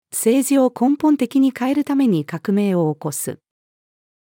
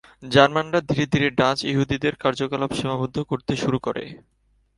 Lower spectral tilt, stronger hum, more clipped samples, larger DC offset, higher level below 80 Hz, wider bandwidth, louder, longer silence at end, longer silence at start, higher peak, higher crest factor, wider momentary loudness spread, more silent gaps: about the same, -5.5 dB/octave vs -5.5 dB/octave; neither; neither; neither; second, -72 dBFS vs -50 dBFS; first, 18 kHz vs 11.5 kHz; first, -18 LUFS vs -22 LUFS; first, 0.85 s vs 0.6 s; about the same, 0.15 s vs 0.2 s; second, -4 dBFS vs 0 dBFS; second, 14 dB vs 22 dB; about the same, 9 LU vs 9 LU; neither